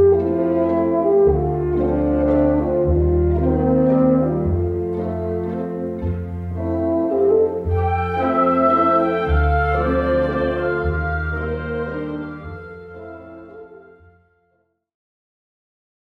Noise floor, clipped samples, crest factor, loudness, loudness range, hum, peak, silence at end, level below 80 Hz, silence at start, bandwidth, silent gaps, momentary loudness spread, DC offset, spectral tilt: -67 dBFS; under 0.1%; 14 dB; -19 LUFS; 11 LU; none; -4 dBFS; 2.3 s; -30 dBFS; 0 s; 4.9 kHz; none; 13 LU; under 0.1%; -10.5 dB/octave